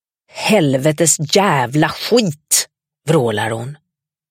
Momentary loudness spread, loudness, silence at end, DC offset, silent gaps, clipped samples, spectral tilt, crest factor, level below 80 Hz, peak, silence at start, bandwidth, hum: 14 LU; -15 LUFS; 0.55 s; under 0.1%; none; under 0.1%; -4 dB/octave; 16 dB; -58 dBFS; 0 dBFS; 0.35 s; 16.5 kHz; none